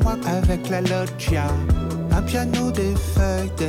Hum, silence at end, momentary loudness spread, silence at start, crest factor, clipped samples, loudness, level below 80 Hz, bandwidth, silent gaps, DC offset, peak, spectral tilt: none; 0 s; 2 LU; 0 s; 10 dB; under 0.1%; -22 LUFS; -26 dBFS; 16 kHz; none; under 0.1%; -10 dBFS; -6.5 dB/octave